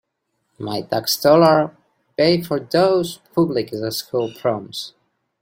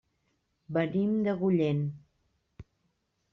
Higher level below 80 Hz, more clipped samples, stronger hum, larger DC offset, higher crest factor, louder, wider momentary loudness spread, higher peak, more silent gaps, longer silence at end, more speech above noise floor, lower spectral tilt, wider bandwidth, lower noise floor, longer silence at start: first, -60 dBFS vs -66 dBFS; neither; neither; neither; about the same, 18 dB vs 16 dB; first, -19 LUFS vs -29 LUFS; first, 16 LU vs 9 LU; first, -2 dBFS vs -16 dBFS; neither; second, 0.55 s vs 0.7 s; first, 54 dB vs 49 dB; second, -5 dB/octave vs -8 dB/octave; first, 16.5 kHz vs 6.2 kHz; second, -73 dBFS vs -77 dBFS; about the same, 0.6 s vs 0.7 s